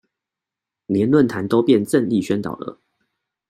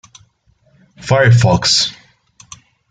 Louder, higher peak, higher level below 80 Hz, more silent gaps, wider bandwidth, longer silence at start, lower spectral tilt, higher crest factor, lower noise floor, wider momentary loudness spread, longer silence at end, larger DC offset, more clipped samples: second, -19 LUFS vs -12 LUFS; about the same, -4 dBFS vs -2 dBFS; second, -60 dBFS vs -46 dBFS; neither; first, 14 kHz vs 9.4 kHz; about the same, 0.9 s vs 1 s; first, -7 dB/octave vs -4 dB/octave; about the same, 18 dB vs 14 dB; first, -86 dBFS vs -56 dBFS; first, 13 LU vs 9 LU; second, 0.75 s vs 1 s; neither; neither